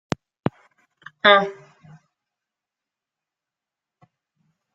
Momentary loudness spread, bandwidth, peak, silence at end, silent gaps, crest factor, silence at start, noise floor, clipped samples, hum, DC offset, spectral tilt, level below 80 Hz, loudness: 16 LU; 7.8 kHz; -2 dBFS; 3.2 s; none; 24 dB; 1.25 s; -88 dBFS; under 0.1%; none; under 0.1%; -5 dB/octave; -66 dBFS; -20 LUFS